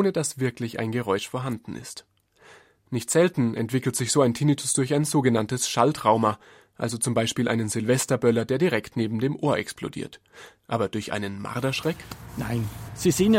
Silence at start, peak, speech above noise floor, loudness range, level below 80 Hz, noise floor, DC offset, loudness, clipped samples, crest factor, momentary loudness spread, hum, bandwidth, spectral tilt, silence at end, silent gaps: 0 s; -4 dBFS; 29 dB; 6 LU; -56 dBFS; -54 dBFS; under 0.1%; -25 LUFS; under 0.1%; 20 dB; 12 LU; none; 16 kHz; -5 dB/octave; 0 s; none